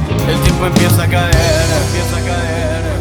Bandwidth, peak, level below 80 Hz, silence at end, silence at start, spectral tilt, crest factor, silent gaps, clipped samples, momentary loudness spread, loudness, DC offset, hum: over 20 kHz; 0 dBFS; -22 dBFS; 0 s; 0 s; -5 dB/octave; 12 dB; none; under 0.1%; 6 LU; -13 LUFS; under 0.1%; none